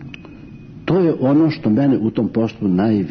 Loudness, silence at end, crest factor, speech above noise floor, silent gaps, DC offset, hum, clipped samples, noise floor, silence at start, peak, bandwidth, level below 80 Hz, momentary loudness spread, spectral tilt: -17 LUFS; 0 s; 10 dB; 21 dB; none; under 0.1%; none; under 0.1%; -37 dBFS; 0 s; -6 dBFS; 6.4 kHz; -50 dBFS; 18 LU; -10 dB/octave